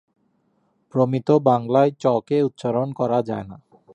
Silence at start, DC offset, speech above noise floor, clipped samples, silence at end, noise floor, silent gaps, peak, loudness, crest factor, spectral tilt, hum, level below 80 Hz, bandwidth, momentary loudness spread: 0.95 s; under 0.1%; 46 dB; under 0.1%; 0.4 s; -66 dBFS; none; -2 dBFS; -21 LUFS; 18 dB; -8.5 dB/octave; none; -62 dBFS; 8.8 kHz; 10 LU